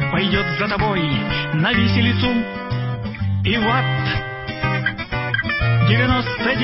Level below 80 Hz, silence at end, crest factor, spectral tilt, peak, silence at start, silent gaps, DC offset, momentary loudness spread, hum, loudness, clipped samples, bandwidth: -36 dBFS; 0 s; 16 dB; -10 dB/octave; -4 dBFS; 0 s; none; under 0.1%; 8 LU; none; -19 LUFS; under 0.1%; 5.8 kHz